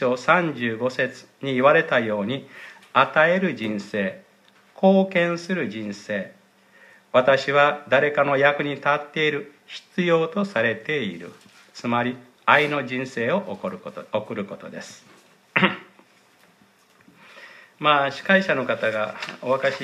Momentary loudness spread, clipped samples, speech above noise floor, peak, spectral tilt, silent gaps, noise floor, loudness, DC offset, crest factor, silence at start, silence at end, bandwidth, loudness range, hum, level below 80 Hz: 14 LU; under 0.1%; 35 dB; 0 dBFS; -5.5 dB/octave; none; -57 dBFS; -22 LUFS; under 0.1%; 24 dB; 0 s; 0 s; 12 kHz; 7 LU; none; -72 dBFS